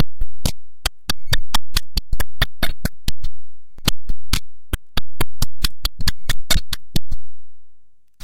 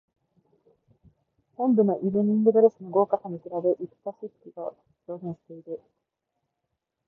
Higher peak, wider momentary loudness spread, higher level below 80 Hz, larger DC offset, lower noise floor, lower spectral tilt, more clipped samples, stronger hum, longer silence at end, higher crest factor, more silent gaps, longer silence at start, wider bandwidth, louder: first, -4 dBFS vs -8 dBFS; second, 8 LU vs 20 LU; first, -26 dBFS vs -74 dBFS; neither; second, -41 dBFS vs -82 dBFS; second, -3 dB/octave vs -13 dB/octave; neither; neither; second, 0 s vs 1.3 s; second, 8 dB vs 20 dB; neither; second, 0 s vs 1.6 s; first, 17 kHz vs 1.9 kHz; about the same, -25 LUFS vs -24 LUFS